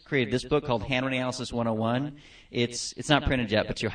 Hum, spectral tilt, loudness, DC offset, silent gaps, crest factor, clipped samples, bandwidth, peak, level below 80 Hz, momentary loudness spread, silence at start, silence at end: none; -5 dB/octave; -28 LUFS; under 0.1%; none; 24 dB; under 0.1%; 9.8 kHz; -4 dBFS; -46 dBFS; 6 LU; 0.1 s; 0 s